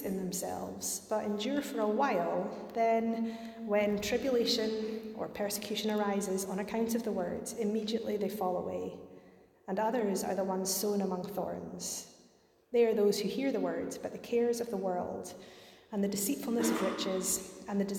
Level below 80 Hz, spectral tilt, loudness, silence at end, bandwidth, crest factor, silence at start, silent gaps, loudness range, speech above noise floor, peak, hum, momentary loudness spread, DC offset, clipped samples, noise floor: -68 dBFS; -4 dB/octave; -33 LUFS; 0 s; 17 kHz; 16 dB; 0 s; none; 3 LU; 32 dB; -16 dBFS; none; 10 LU; under 0.1%; under 0.1%; -65 dBFS